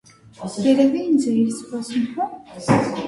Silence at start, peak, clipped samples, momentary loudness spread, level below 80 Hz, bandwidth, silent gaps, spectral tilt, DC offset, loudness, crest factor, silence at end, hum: 0.4 s; -2 dBFS; under 0.1%; 13 LU; -54 dBFS; 11.5 kHz; none; -6 dB/octave; under 0.1%; -20 LUFS; 18 dB; 0 s; none